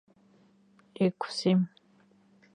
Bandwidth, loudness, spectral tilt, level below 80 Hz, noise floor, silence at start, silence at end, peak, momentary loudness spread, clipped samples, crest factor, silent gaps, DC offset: 10 kHz; -29 LUFS; -6.5 dB/octave; -78 dBFS; -63 dBFS; 1 s; 0.9 s; -14 dBFS; 5 LU; under 0.1%; 20 dB; none; under 0.1%